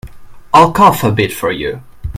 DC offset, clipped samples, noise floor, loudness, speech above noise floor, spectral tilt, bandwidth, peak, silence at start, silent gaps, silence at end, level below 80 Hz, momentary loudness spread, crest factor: under 0.1%; 0.6%; -31 dBFS; -11 LUFS; 19 dB; -5.5 dB/octave; 16.5 kHz; 0 dBFS; 0.05 s; none; 0 s; -34 dBFS; 14 LU; 12 dB